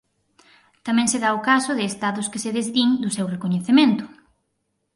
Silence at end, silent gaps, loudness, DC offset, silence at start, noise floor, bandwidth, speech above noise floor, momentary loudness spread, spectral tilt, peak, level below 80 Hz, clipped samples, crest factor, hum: 0.9 s; none; -21 LUFS; under 0.1%; 0.85 s; -74 dBFS; 11.5 kHz; 53 dB; 9 LU; -4 dB/octave; -4 dBFS; -66 dBFS; under 0.1%; 18 dB; none